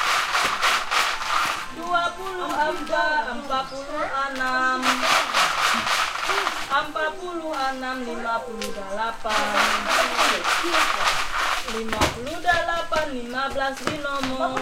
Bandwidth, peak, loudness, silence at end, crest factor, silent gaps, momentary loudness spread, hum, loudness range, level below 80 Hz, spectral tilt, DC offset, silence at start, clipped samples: 16.5 kHz; -4 dBFS; -23 LUFS; 0 s; 18 dB; none; 8 LU; none; 4 LU; -44 dBFS; -1.5 dB/octave; under 0.1%; 0 s; under 0.1%